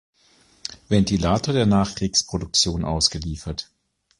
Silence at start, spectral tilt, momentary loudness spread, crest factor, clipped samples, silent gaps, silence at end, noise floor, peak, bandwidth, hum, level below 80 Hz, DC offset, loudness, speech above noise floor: 0.7 s; -4.5 dB/octave; 13 LU; 18 dB; under 0.1%; none; 0.55 s; -58 dBFS; -4 dBFS; 11.5 kHz; none; -38 dBFS; under 0.1%; -21 LUFS; 36 dB